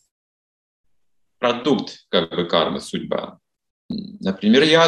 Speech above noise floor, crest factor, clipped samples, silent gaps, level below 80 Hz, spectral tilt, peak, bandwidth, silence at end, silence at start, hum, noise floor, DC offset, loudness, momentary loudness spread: 54 dB; 20 dB; under 0.1%; 3.70-3.89 s; -62 dBFS; -5 dB/octave; -2 dBFS; 11.5 kHz; 0 s; 1.4 s; none; -73 dBFS; under 0.1%; -21 LUFS; 15 LU